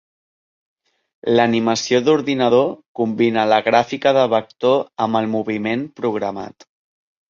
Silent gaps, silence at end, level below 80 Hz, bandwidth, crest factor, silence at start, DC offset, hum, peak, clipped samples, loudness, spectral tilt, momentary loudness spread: 2.88-2.95 s; 0.8 s; -62 dBFS; 7.4 kHz; 16 dB; 1.25 s; under 0.1%; none; -2 dBFS; under 0.1%; -18 LUFS; -5 dB/octave; 8 LU